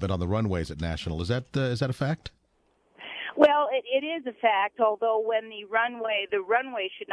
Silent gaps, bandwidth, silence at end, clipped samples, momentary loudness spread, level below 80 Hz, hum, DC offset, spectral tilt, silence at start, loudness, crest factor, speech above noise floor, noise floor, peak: none; 11 kHz; 0 s; under 0.1%; 10 LU; -50 dBFS; none; under 0.1%; -6.5 dB/octave; 0 s; -27 LUFS; 22 dB; 41 dB; -68 dBFS; -6 dBFS